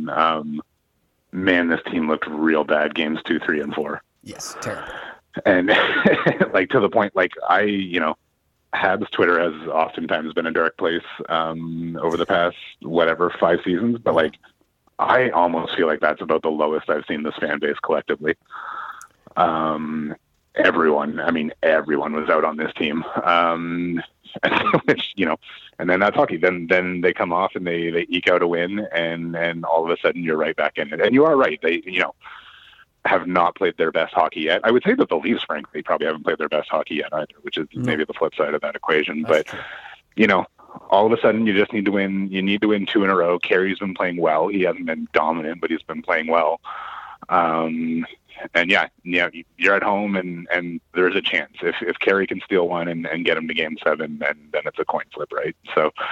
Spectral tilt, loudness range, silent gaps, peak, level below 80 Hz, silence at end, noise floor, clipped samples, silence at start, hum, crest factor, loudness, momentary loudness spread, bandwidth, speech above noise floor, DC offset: -6 dB/octave; 4 LU; none; -2 dBFS; -60 dBFS; 0 s; -68 dBFS; under 0.1%; 0 s; none; 20 dB; -21 LUFS; 11 LU; 12 kHz; 47 dB; under 0.1%